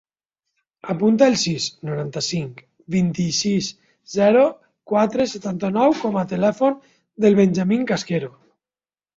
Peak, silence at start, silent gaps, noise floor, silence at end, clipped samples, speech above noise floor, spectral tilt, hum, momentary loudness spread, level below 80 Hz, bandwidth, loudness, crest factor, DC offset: -2 dBFS; 0.85 s; none; under -90 dBFS; 0.85 s; under 0.1%; over 71 dB; -5.5 dB/octave; none; 12 LU; -60 dBFS; 7.8 kHz; -20 LUFS; 18 dB; under 0.1%